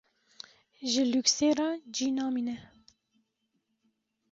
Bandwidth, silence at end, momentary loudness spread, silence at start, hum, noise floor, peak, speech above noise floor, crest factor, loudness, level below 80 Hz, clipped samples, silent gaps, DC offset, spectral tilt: 8 kHz; 1.65 s; 24 LU; 0.8 s; none; -79 dBFS; -12 dBFS; 50 dB; 20 dB; -29 LUFS; -72 dBFS; under 0.1%; none; under 0.1%; -2 dB/octave